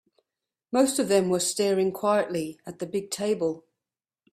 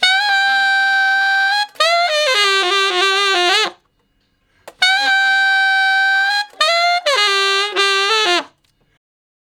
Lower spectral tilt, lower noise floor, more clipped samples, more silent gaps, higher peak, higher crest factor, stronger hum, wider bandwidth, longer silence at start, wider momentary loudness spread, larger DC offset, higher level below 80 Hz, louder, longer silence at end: first, -4 dB/octave vs 1.5 dB/octave; first, under -90 dBFS vs -62 dBFS; neither; neither; second, -8 dBFS vs 0 dBFS; about the same, 18 dB vs 16 dB; neither; about the same, 16 kHz vs 17.5 kHz; first, 0.7 s vs 0 s; first, 9 LU vs 3 LU; neither; about the same, -70 dBFS vs -74 dBFS; second, -26 LUFS vs -13 LUFS; second, 0.75 s vs 1.15 s